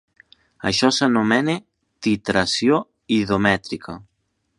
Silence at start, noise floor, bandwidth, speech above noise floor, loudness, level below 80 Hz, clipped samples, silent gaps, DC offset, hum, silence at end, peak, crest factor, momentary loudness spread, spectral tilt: 0.65 s; -55 dBFS; 11.5 kHz; 35 dB; -20 LUFS; -52 dBFS; under 0.1%; none; under 0.1%; none; 0.55 s; 0 dBFS; 20 dB; 13 LU; -4.5 dB/octave